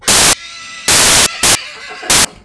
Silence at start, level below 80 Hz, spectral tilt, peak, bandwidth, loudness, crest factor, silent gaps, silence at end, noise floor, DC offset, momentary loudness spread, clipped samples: 0 s; -34 dBFS; 0 dB/octave; 0 dBFS; 11 kHz; -9 LUFS; 12 dB; none; 0.15 s; -30 dBFS; under 0.1%; 18 LU; under 0.1%